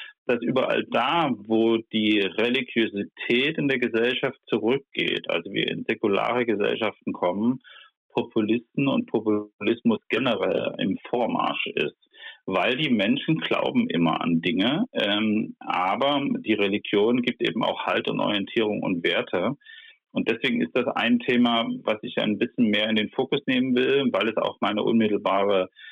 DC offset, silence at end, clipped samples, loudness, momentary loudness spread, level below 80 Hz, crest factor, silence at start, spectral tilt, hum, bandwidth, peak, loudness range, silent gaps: under 0.1%; 0 s; under 0.1%; -24 LUFS; 5 LU; -70 dBFS; 14 dB; 0 s; -7 dB/octave; none; 6.6 kHz; -10 dBFS; 2 LU; 0.18-0.26 s, 7.97-8.09 s, 9.54-9.59 s